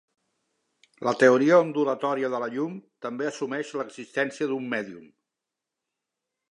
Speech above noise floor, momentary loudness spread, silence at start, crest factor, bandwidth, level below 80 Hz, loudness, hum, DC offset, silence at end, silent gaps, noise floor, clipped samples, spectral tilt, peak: 62 dB; 14 LU; 1 s; 22 dB; 10.5 kHz; -82 dBFS; -25 LUFS; none; under 0.1%; 1.5 s; none; -87 dBFS; under 0.1%; -5.5 dB/octave; -4 dBFS